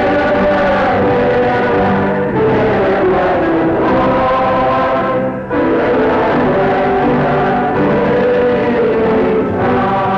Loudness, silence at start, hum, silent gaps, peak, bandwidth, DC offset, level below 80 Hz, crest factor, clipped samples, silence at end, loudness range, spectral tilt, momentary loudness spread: -13 LUFS; 0 s; none; none; -6 dBFS; 7.2 kHz; under 0.1%; -34 dBFS; 6 dB; under 0.1%; 0 s; 1 LU; -8.5 dB/octave; 2 LU